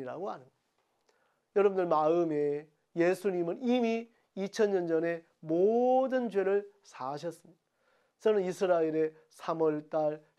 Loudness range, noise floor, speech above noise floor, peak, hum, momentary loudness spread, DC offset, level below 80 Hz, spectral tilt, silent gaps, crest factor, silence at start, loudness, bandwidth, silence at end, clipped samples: 2 LU; -77 dBFS; 47 dB; -14 dBFS; none; 13 LU; under 0.1%; -90 dBFS; -6.5 dB/octave; none; 16 dB; 0 s; -31 LUFS; 13 kHz; 0.2 s; under 0.1%